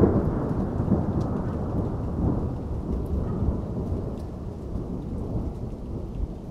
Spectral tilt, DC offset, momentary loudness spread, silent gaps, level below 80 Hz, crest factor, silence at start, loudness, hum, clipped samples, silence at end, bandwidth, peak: -10.5 dB/octave; under 0.1%; 9 LU; none; -34 dBFS; 20 dB; 0 s; -29 LUFS; none; under 0.1%; 0 s; 7.8 kHz; -8 dBFS